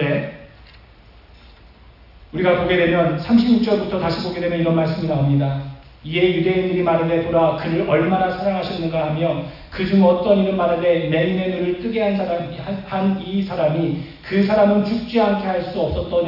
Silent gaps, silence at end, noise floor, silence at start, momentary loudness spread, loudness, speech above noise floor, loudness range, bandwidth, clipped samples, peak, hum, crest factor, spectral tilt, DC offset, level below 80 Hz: none; 0 s; -46 dBFS; 0 s; 9 LU; -19 LUFS; 28 dB; 2 LU; 5.8 kHz; under 0.1%; -4 dBFS; none; 16 dB; -9 dB/octave; under 0.1%; -44 dBFS